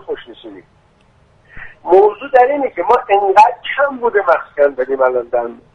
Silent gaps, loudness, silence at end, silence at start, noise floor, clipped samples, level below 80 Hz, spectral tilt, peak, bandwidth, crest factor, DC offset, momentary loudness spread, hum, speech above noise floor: none; -13 LUFS; 0.2 s; 0.1 s; -52 dBFS; under 0.1%; -50 dBFS; -5 dB/octave; 0 dBFS; 9.4 kHz; 14 dB; under 0.1%; 10 LU; none; 38 dB